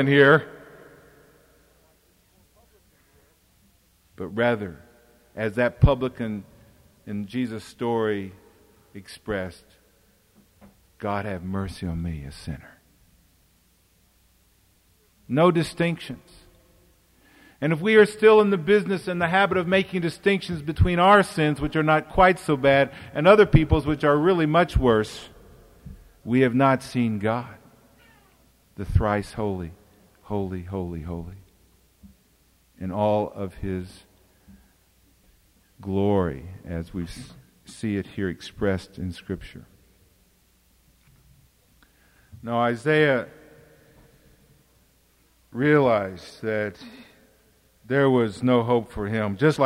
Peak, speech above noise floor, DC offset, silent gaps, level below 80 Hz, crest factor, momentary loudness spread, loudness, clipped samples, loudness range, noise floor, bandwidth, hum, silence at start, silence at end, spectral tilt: -4 dBFS; 40 dB; under 0.1%; none; -40 dBFS; 22 dB; 20 LU; -23 LUFS; under 0.1%; 14 LU; -62 dBFS; 15.5 kHz; none; 0 s; 0 s; -7 dB/octave